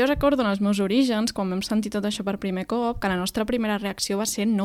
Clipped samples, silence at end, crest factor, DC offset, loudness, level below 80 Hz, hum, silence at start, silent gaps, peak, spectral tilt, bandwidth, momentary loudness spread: under 0.1%; 0 s; 16 dB; under 0.1%; -24 LUFS; -44 dBFS; none; 0 s; none; -8 dBFS; -4.5 dB/octave; 16 kHz; 6 LU